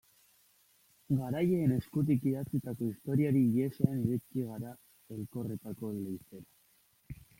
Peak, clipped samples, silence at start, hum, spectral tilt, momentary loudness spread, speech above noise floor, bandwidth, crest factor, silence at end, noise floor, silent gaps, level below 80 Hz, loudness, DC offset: -12 dBFS; under 0.1%; 1.1 s; none; -9 dB/octave; 17 LU; 37 dB; 16.5 kHz; 22 dB; 0.25 s; -69 dBFS; none; -64 dBFS; -33 LUFS; under 0.1%